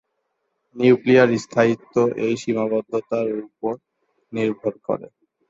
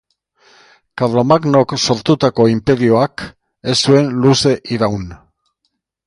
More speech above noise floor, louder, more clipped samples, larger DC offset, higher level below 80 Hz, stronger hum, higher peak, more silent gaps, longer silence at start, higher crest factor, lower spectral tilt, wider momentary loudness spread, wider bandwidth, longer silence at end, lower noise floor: about the same, 54 dB vs 57 dB; second, -21 LUFS vs -14 LUFS; neither; neither; second, -64 dBFS vs -46 dBFS; neither; about the same, -2 dBFS vs 0 dBFS; neither; second, 0.75 s vs 0.95 s; about the same, 20 dB vs 16 dB; about the same, -6.5 dB/octave vs -5.5 dB/octave; about the same, 13 LU vs 14 LU; second, 8 kHz vs 11.5 kHz; second, 0.45 s vs 0.9 s; first, -74 dBFS vs -70 dBFS